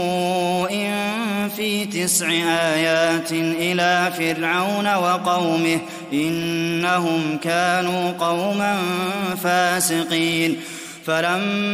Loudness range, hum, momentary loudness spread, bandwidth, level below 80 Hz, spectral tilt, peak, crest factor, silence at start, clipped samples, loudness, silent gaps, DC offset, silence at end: 2 LU; none; 5 LU; 16 kHz; -64 dBFS; -3.5 dB/octave; -4 dBFS; 16 dB; 0 s; under 0.1%; -20 LUFS; none; under 0.1%; 0 s